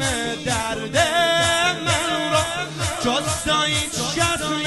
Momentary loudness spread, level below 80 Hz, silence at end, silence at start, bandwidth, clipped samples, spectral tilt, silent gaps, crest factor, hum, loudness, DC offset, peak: 6 LU; -42 dBFS; 0 s; 0 s; 12.5 kHz; under 0.1%; -2.5 dB/octave; none; 16 dB; none; -20 LUFS; under 0.1%; -4 dBFS